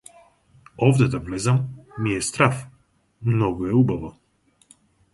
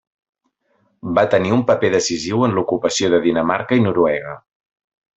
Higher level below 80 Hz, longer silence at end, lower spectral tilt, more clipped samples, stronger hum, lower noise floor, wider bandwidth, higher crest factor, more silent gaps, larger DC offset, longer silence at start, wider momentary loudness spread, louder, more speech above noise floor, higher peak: first, -48 dBFS vs -54 dBFS; first, 1.05 s vs 0.8 s; first, -6.5 dB/octave vs -5 dB/octave; neither; neither; about the same, -63 dBFS vs -65 dBFS; first, 11.5 kHz vs 8.2 kHz; first, 22 dB vs 16 dB; neither; neither; second, 0.8 s vs 1.05 s; first, 11 LU vs 7 LU; second, -22 LUFS vs -17 LUFS; second, 42 dB vs 48 dB; about the same, -2 dBFS vs -2 dBFS